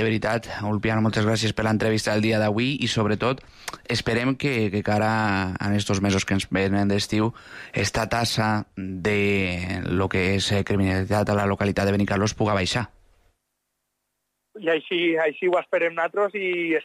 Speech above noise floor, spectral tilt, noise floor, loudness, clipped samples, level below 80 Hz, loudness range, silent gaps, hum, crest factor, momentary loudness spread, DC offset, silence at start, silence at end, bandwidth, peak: 55 dB; -5.5 dB/octave; -78 dBFS; -23 LUFS; under 0.1%; -48 dBFS; 3 LU; none; none; 12 dB; 5 LU; under 0.1%; 0 s; 0 s; 14.5 kHz; -10 dBFS